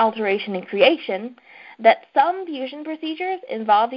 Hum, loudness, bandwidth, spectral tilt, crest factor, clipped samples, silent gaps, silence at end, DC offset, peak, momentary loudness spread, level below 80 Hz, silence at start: none; -21 LUFS; 5.6 kHz; -8 dB/octave; 20 dB; under 0.1%; none; 0 s; under 0.1%; -2 dBFS; 12 LU; -68 dBFS; 0 s